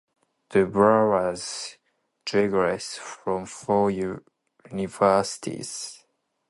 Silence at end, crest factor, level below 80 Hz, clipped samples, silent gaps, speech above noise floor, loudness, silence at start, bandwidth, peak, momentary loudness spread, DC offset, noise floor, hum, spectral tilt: 0.55 s; 20 dB; -58 dBFS; under 0.1%; none; 43 dB; -24 LUFS; 0.5 s; 11.5 kHz; -4 dBFS; 15 LU; under 0.1%; -67 dBFS; none; -5 dB/octave